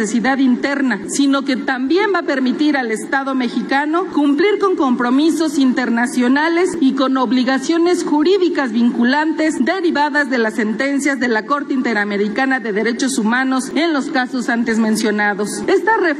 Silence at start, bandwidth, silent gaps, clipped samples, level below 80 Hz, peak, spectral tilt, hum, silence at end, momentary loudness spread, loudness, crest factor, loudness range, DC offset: 0 s; 12.5 kHz; none; under 0.1%; -62 dBFS; -4 dBFS; -4 dB/octave; none; 0 s; 4 LU; -16 LUFS; 12 dB; 2 LU; under 0.1%